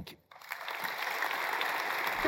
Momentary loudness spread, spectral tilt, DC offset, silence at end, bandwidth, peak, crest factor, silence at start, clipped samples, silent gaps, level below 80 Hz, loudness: 13 LU; -2 dB/octave; under 0.1%; 0 s; 16.5 kHz; -16 dBFS; 20 dB; 0 s; under 0.1%; none; -64 dBFS; -34 LUFS